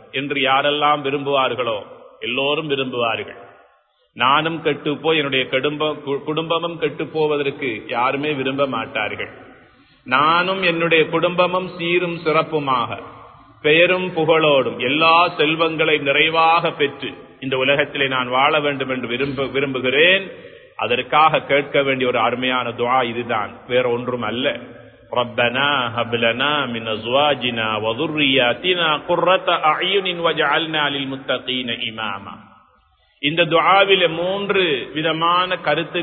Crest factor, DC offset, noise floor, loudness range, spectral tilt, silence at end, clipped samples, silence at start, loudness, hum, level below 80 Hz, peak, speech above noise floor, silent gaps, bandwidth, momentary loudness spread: 18 dB; under 0.1%; -59 dBFS; 5 LU; -9.5 dB/octave; 0 s; under 0.1%; 0.15 s; -18 LUFS; none; -58 dBFS; 0 dBFS; 40 dB; none; 4.5 kHz; 9 LU